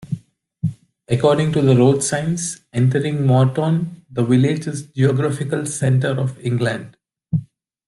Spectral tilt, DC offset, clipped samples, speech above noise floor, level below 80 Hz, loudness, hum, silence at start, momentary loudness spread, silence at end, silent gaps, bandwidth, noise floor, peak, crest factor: -6.5 dB/octave; under 0.1%; under 0.1%; 22 dB; -54 dBFS; -19 LUFS; none; 0 s; 11 LU; 0.45 s; none; 12 kHz; -39 dBFS; -2 dBFS; 16 dB